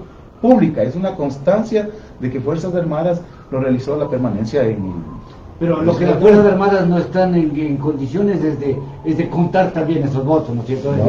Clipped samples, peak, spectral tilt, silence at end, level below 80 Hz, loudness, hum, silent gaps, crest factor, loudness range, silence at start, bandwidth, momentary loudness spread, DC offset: under 0.1%; 0 dBFS; -9 dB/octave; 0 s; -42 dBFS; -17 LUFS; none; none; 16 dB; 5 LU; 0 s; 7.4 kHz; 10 LU; under 0.1%